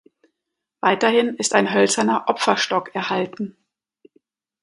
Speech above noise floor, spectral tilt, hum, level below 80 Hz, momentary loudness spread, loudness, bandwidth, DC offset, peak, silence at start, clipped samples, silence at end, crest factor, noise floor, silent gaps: 63 dB; -3 dB/octave; none; -70 dBFS; 8 LU; -19 LUFS; 11.5 kHz; under 0.1%; 0 dBFS; 0.85 s; under 0.1%; 1.1 s; 22 dB; -82 dBFS; none